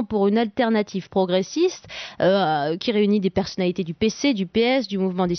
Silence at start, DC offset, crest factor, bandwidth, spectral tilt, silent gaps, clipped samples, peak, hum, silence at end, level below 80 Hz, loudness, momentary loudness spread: 0 s; under 0.1%; 12 dB; 6.4 kHz; -4.5 dB/octave; none; under 0.1%; -8 dBFS; none; 0 s; -54 dBFS; -22 LUFS; 5 LU